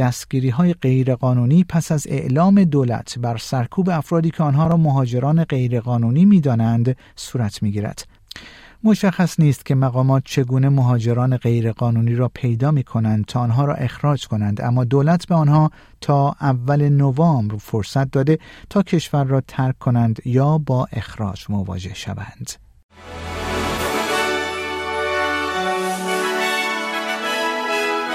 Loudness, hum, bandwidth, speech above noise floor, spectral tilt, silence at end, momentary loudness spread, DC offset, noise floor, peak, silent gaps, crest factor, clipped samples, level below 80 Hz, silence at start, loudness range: -19 LUFS; none; 15 kHz; 24 dB; -7 dB/octave; 0 s; 10 LU; under 0.1%; -41 dBFS; -4 dBFS; 22.83-22.89 s; 14 dB; under 0.1%; -46 dBFS; 0 s; 5 LU